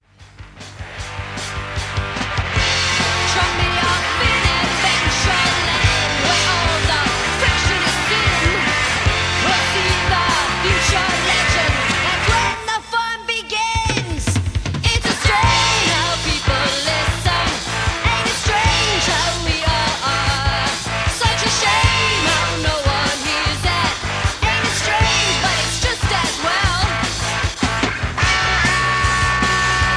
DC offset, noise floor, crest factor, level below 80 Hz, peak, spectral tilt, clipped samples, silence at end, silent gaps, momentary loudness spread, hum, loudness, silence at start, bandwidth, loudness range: under 0.1%; -40 dBFS; 16 dB; -28 dBFS; -2 dBFS; -3 dB/octave; under 0.1%; 0 s; none; 6 LU; none; -16 LUFS; 0.2 s; 11 kHz; 2 LU